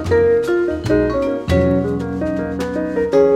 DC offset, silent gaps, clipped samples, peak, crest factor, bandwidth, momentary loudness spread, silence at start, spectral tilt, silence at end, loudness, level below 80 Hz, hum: under 0.1%; none; under 0.1%; -2 dBFS; 14 dB; 13.5 kHz; 7 LU; 0 s; -7.5 dB/octave; 0 s; -18 LUFS; -34 dBFS; none